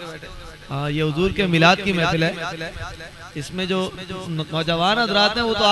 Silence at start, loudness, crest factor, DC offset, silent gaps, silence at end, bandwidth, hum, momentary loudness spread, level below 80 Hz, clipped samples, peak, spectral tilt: 0 s; -20 LUFS; 20 dB; under 0.1%; none; 0 s; 12 kHz; none; 18 LU; -42 dBFS; under 0.1%; 0 dBFS; -5 dB/octave